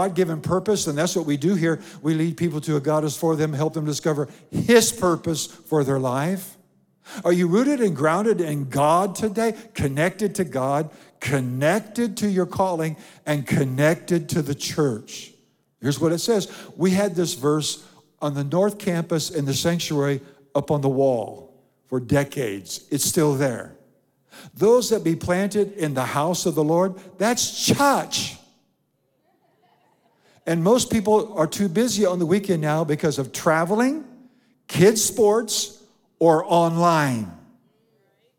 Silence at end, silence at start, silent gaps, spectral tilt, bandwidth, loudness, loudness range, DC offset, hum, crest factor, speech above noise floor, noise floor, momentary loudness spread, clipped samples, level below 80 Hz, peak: 1 s; 0 s; none; -5 dB/octave; 18.5 kHz; -22 LUFS; 3 LU; under 0.1%; none; 20 dB; 48 dB; -69 dBFS; 10 LU; under 0.1%; -58 dBFS; -2 dBFS